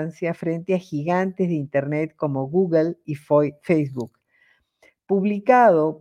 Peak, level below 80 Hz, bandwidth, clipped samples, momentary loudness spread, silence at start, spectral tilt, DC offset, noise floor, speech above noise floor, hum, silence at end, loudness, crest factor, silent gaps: -4 dBFS; -68 dBFS; 11 kHz; under 0.1%; 11 LU; 0 s; -9 dB/octave; under 0.1%; -62 dBFS; 41 dB; none; 0.05 s; -21 LUFS; 18 dB; none